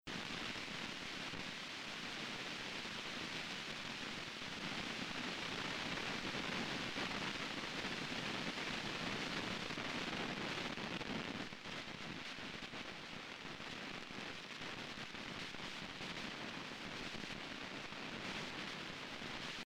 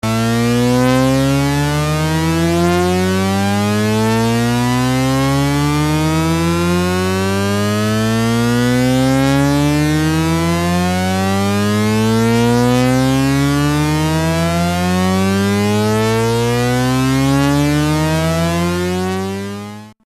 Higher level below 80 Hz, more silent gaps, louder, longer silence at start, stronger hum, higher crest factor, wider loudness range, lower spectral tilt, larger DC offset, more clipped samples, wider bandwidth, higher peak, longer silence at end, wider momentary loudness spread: second, -66 dBFS vs -34 dBFS; neither; second, -44 LUFS vs -15 LUFS; about the same, 0.05 s vs 0.05 s; neither; first, 16 dB vs 10 dB; first, 5 LU vs 1 LU; second, -3 dB/octave vs -5.5 dB/octave; neither; neither; first, 16 kHz vs 14 kHz; second, -28 dBFS vs -4 dBFS; about the same, 0.05 s vs 0.15 s; first, 6 LU vs 3 LU